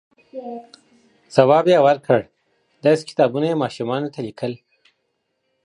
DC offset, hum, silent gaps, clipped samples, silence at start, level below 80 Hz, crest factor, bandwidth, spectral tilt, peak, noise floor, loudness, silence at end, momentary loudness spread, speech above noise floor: under 0.1%; none; none; under 0.1%; 0.35 s; -66 dBFS; 20 dB; 10.5 kHz; -6.5 dB/octave; 0 dBFS; -72 dBFS; -19 LUFS; 1.1 s; 21 LU; 54 dB